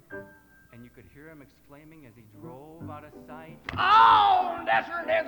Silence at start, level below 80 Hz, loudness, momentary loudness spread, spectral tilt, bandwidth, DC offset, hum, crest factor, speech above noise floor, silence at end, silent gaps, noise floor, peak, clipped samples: 0.1 s; -60 dBFS; -21 LUFS; 28 LU; -4.5 dB/octave; 19.5 kHz; under 0.1%; none; 20 dB; 29 dB; 0 s; none; -54 dBFS; -8 dBFS; under 0.1%